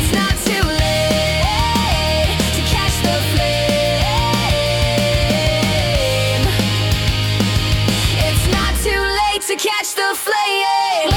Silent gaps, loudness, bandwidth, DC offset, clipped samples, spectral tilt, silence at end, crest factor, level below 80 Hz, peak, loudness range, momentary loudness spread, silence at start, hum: none; -16 LUFS; 18 kHz; under 0.1%; under 0.1%; -4 dB/octave; 0 s; 12 dB; -24 dBFS; -4 dBFS; 1 LU; 1 LU; 0 s; none